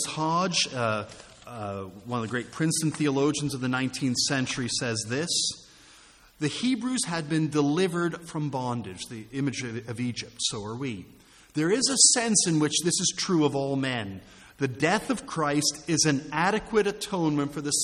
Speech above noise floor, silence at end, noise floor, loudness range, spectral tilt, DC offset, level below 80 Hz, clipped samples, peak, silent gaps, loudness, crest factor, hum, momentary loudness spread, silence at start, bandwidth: 28 dB; 0 s; -54 dBFS; 6 LU; -3.5 dB/octave; under 0.1%; -60 dBFS; under 0.1%; -4 dBFS; none; -26 LUFS; 24 dB; none; 12 LU; 0 s; 13.5 kHz